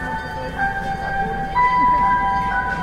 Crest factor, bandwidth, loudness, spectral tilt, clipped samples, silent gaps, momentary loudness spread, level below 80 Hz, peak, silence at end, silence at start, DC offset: 12 dB; 12.5 kHz; -19 LUFS; -6 dB/octave; under 0.1%; none; 10 LU; -34 dBFS; -6 dBFS; 0 s; 0 s; under 0.1%